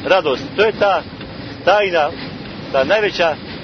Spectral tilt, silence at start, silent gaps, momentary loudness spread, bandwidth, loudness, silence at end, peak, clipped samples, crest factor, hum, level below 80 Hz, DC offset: -5 dB/octave; 0 s; none; 15 LU; 6.6 kHz; -16 LUFS; 0 s; 0 dBFS; under 0.1%; 16 dB; none; -46 dBFS; under 0.1%